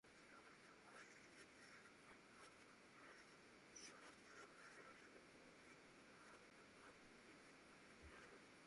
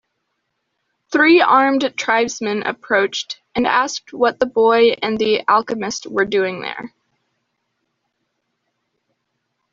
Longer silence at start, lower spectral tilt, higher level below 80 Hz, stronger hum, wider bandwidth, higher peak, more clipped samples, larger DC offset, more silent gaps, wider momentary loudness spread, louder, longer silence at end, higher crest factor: second, 0.05 s vs 1.1 s; about the same, -2.5 dB/octave vs -3.5 dB/octave; second, -84 dBFS vs -60 dBFS; neither; first, 11.5 kHz vs 7.6 kHz; second, -48 dBFS vs -2 dBFS; neither; neither; neither; second, 4 LU vs 11 LU; second, -65 LUFS vs -17 LUFS; second, 0 s vs 2.85 s; about the same, 16 dB vs 16 dB